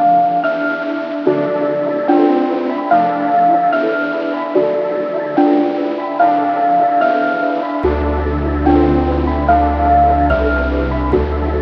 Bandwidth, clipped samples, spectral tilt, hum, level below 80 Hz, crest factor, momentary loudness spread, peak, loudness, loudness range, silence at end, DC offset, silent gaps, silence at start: 6 kHz; under 0.1%; -9.5 dB/octave; none; -26 dBFS; 14 dB; 6 LU; 0 dBFS; -15 LUFS; 1 LU; 0 s; under 0.1%; none; 0 s